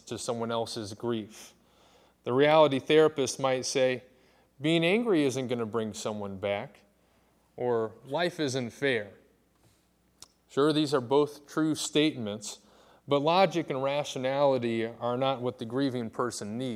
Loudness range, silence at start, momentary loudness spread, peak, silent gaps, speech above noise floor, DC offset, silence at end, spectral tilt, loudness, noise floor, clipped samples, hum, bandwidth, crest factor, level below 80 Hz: 7 LU; 0.05 s; 12 LU; -8 dBFS; none; 39 dB; under 0.1%; 0 s; -4.5 dB/octave; -28 LUFS; -67 dBFS; under 0.1%; none; 15.5 kHz; 20 dB; -74 dBFS